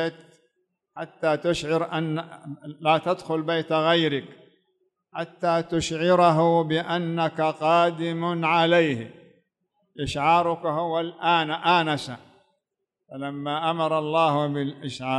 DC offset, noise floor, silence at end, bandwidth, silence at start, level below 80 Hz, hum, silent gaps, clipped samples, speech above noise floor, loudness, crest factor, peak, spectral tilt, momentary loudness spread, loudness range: under 0.1%; -82 dBFS; 0 s; 11.5 kHz; 0 s; -58 dBFS; none; none; under 0.1%; 59 dB; -23 LUFS; 18 dB; -8 dBFS; -5.5 dB/octave; 14 LU; 4 LU